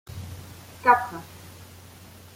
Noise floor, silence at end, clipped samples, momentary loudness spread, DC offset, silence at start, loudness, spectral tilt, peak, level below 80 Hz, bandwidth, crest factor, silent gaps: -47 dBFS; 0.3 s; under 0.1%; 26 LU; under 0.1%; 0.1 s; -22 LUFS; -4.5 dB/octave; -4 dBFS; -58 dBFS; 16.5 kHz; 24 dB; none